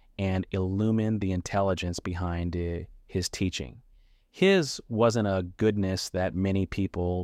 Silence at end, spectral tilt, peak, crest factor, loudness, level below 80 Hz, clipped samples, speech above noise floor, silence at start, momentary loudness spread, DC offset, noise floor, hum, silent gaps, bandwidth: 0 s; -6 dB/octave; -10 dBFS; 18 dB; -28 LUFS; -48 dBFS; under 0.1%; 32 dB; 0.2 s; 8 LU; under 0.1%; -59 dBFS; none; none; 14.5 kHz